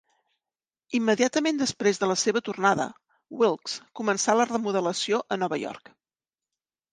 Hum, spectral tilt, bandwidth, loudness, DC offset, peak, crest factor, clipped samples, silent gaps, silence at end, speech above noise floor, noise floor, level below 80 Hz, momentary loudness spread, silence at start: none; -3.5 dB/octave; 10 kHz; -25 LUFS; under 0.1%; -6 dBFS; 20 dB; under 0.1%; none; 1.15 s; over 65 dB; under -90 dBFS; -72 dBFS; 9 LU; 0.9 s